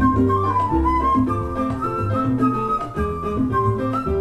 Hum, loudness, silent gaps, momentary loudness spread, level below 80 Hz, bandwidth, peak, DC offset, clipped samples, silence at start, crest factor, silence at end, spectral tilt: none; -21 LUFS; none; 5 LU; -32 dBFS; 12 kHz; -4 dBFS; under 0.1%; under 0.1%; 0 s; 14 dB; 0 s; -9 dB/octave